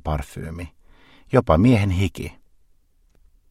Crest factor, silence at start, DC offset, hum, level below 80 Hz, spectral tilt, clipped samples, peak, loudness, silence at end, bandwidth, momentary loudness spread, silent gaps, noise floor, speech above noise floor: 22 dB; 0.05 s; under 0.1%; none; -36 dBFS; -7.5 dB/octave; under 0.1%; -2 dBFS; -20 LUFS; 1.2 s; 14 kHz; 20 LU; none; -58 dBFS; 38 dB